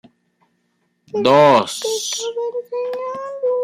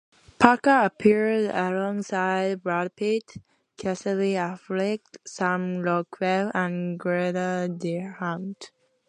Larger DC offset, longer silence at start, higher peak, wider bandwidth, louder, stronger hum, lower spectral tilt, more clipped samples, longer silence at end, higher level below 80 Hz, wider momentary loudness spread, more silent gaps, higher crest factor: neither; first, 1.15 s vs 0.4 s; about the same, 0 dBFS vs 0 dBFS; first, 15.5 kHz vs 10.5 kHz; first, -18 LUFS vs -25 LUFS; neither; second, -3.5 dB/octave vs -6 dB/octave; neither; second, 0 s vs 0.4 s; about the same, -66 dBFS vs -64 dBFS; first, 14 LU vs 11 LU; neither; second, 18 dB vs 24 dB